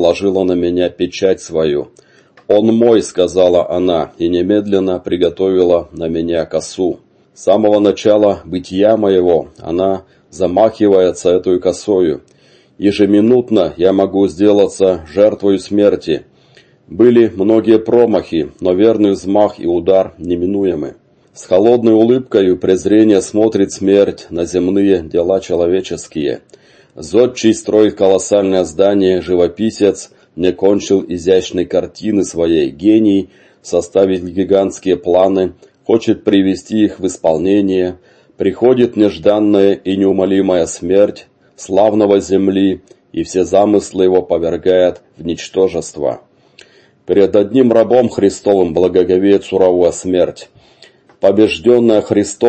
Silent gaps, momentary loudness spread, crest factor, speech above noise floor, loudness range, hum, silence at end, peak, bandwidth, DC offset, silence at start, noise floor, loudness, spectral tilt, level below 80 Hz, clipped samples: none; 8 LU; 12 dB; 35 dB; 3 LU; none; 0 s; 0 dBFS; 8.8 kHz; under 0.1%; 0 s; -47 dBFS; -13 LUFS; -6 dB/octave; -46 dBFS; under 0.1%